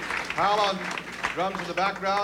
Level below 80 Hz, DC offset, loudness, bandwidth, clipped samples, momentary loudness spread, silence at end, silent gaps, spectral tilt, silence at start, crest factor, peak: -56 dBFS; under 0.1%; -26 LUFS; 16 kHz; under 0.1%; 8 LU; 0 s; none; -3.5 dB/octave; 0 s; 18 dB; -10 dBFS